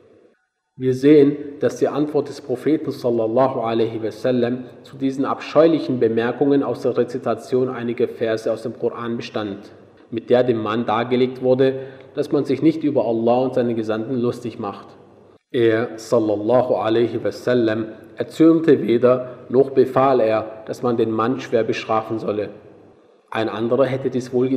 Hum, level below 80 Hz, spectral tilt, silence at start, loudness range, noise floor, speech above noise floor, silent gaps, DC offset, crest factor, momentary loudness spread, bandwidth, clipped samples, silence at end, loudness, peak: none; -66 dBFS; -7.5 dB/octave; 0.8 s; 5 LU; -64 dBFS; 45 dB; none; under 0.1%; 18 dB; 11 LU; 12.5 kHz; under 0.1%; 0 s; -20 LUFS; -2 dBFS